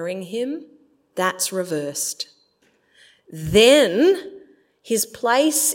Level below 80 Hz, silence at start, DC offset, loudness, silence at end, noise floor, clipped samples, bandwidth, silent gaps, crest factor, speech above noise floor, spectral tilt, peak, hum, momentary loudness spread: -52 dBFS; 0 s; under 0.1%; -19 LUFS; 0 s; -63 dBFS; under 0.1%; 16.5 kHz; none; 18 dB; 43 dB; -3 dB/octave; -2 dBFS; none; 20 LU